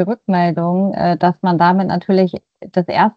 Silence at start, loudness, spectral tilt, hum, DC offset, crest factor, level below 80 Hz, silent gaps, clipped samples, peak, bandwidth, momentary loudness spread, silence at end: 0 s; -16 LUFS; -9.5 dB/octave; none; under 0.1%; 14 dB; -54 dBFS; none; under 0.1%; 0 dBFS; 5.4 kHz; 7 LU; 0.05 s